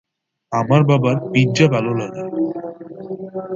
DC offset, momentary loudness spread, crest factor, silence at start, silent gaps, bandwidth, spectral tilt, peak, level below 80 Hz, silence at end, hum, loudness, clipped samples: under 0.1%; 16 LU; 18 dB; 0.5 s; none; 7.6 kHz; -7 dB/octave; 0 dBFS; -56 dBFS; 0 s; none; -18 LUFS; under 0.1%